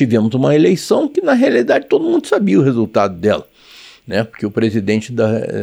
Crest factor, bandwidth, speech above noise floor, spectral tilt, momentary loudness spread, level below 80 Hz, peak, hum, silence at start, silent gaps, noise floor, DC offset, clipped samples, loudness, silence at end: 14 dB; 15.5 kHz; 28 dB; -7 dB/octave; 7 LU; -56 dBFS; -2 dBFS; none; 0 s; none; -41 dBFS; under 0.1%; under 0.1%; -15 LUFS; 0 s